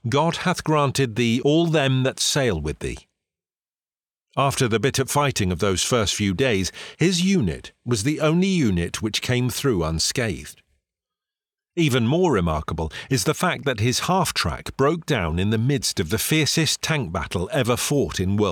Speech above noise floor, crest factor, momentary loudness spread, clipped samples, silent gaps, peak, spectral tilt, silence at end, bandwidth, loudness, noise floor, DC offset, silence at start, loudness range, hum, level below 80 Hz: over 69 dB; 14 dB; 7 LU; under 0.1%; none; -8 dBFS; -4.5 dB/octave; 0 s; 19.5 kHz; -22 LUFS; under -90 dBFS; under 0.1%; 0.05 s; 3 LU; none; -44 dBFS